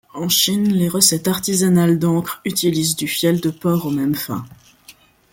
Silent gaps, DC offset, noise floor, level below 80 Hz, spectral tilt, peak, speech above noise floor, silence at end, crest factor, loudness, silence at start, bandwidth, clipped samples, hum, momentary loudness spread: none; under 0.1%; -48 dBFS; -56 dBFS; -4 dB/octave; 0 dBFS; 30 dB; 0.4 s; 18 dB; -17 LUFS; 0.15 s; 17 kHz; under 0.1%; none; 7 LU